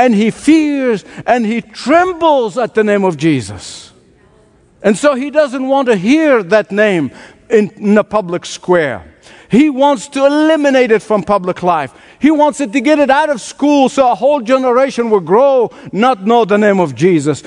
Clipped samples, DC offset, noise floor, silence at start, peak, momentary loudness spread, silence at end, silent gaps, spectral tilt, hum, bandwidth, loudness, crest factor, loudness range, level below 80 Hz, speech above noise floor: under 0.1%; under 0.1%; -48 dBFS; 0 s; 0 dBFS; 7 LU; 0.05 s; none; -5.5 dB/octave; none; 11 kHz; -12 LUFS; 12 dB; 3 LU; -52 dBFS; 36 dB